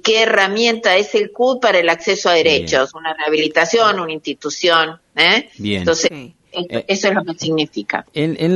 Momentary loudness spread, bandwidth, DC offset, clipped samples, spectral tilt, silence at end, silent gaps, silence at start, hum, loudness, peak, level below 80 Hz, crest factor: 10 LU; 11.5 kHz; under 0.1%; under 0.1%; -3.5 dB/octave; 0 s; none; 0.05 s; none; -16 LUFS; 0 dBFS; -54 dBFS; 16 dB